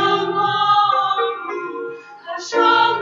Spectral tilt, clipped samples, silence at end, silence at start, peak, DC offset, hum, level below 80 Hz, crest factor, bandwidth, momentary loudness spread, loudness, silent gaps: -3.5 dB/octave; under 0.1%; 0 s; 0 s; -4 dBFS; under 0.1%; none; -70 dBFS; 14 dB; 7.6 kHz; 16 LU; -17 LUFS; none